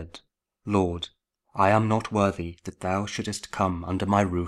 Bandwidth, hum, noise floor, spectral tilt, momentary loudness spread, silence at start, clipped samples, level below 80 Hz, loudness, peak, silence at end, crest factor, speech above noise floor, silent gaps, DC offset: 12.5 kHz; none; -57 dBFS; -6 dB/octave; 15 LU; 0 s; under 0.1%; -50 dBFS; -26 LUFS; -6 dBFS; 0 s; 20 dB; 32 dB; none; under 0.1%